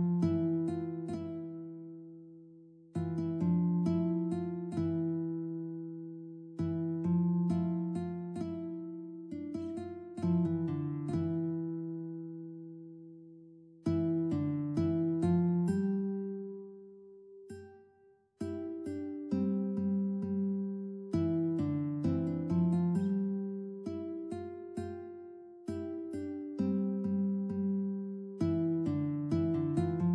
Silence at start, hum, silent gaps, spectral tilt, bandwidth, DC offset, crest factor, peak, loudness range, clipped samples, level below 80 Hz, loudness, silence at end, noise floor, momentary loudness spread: 0 s; none; none; -10 dB/octave; 9.2 kHz; under 0.1%; 14 dB; -20 dBFS; 6 LU; under 0.1%; -66 dBFS; -35 LUFS; 0 s; -66 dBFS; 16 LU